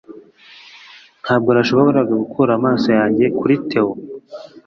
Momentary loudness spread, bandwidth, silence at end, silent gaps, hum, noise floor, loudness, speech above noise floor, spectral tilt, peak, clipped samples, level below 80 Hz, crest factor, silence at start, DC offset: 17 LU; 6.8 kHz; 0.05 s; none; none; -44 dBFS; -16 LUFS; 29 dB; -7.5 dB/octave; -2 dBFS; under 0.1%; -56 dBFS; 16 dB; 0.1 s; under 0.1%